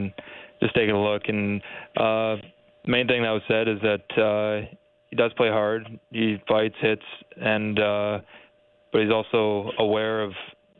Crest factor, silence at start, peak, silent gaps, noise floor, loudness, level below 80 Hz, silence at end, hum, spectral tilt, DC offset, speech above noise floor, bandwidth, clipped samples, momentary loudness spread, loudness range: 16 dB; 0 s; -8 dBFS; none; -59 dBFS; -24 LUFS; -60 dBFS; 0.3 s; none; -9.5 dB/octave; under 0.1%; 35 dB; 4.3 kHz; under 0.1%; 11 LU; 1 LU